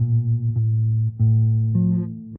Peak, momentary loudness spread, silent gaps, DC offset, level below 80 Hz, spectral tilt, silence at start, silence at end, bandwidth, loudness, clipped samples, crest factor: -10 dBFS; 3 LU; none; under 0.1%; -48 dBFS; -17.5 dB/octave; 0 s; 0 s; 1.1 kHz; -20 LUFS; under 0.1%; 10 dB